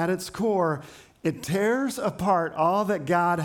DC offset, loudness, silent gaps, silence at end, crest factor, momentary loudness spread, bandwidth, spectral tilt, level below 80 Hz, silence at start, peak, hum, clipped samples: under 0.1%; -25 LUFS; none; 0 s; 14 dB; 7 LU; 19 kHz; -6 dB/octave; -60 dBFS; 0 s; -10 dBFS; none; under 0.1%